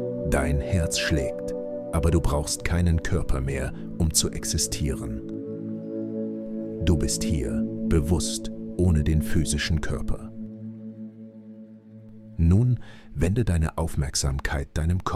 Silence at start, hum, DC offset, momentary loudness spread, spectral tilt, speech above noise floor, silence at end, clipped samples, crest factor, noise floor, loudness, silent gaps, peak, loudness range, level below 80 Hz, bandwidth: 0 s; none; under 0.1%; 16 LU; -5 dB/octave; 22 dB; 0 s; under 0.1%; 18 dB; -45 dBFS; -26 LUFS; none; -8 dBFS; 3 LU; -32 dBFS; 15 kHz